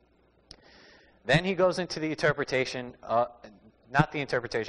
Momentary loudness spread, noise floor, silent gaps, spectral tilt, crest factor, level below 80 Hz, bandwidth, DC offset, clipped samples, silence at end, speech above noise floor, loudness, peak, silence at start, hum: 8 LU; -64 dBFS; none; -5.5 dB/octave; 22 dB; -54 dBFS; 10 kHz; under 0.1%; under 0.1%; 0 s; 37 dB; -28 LUFS; -8 dBFS; 1.25 s; none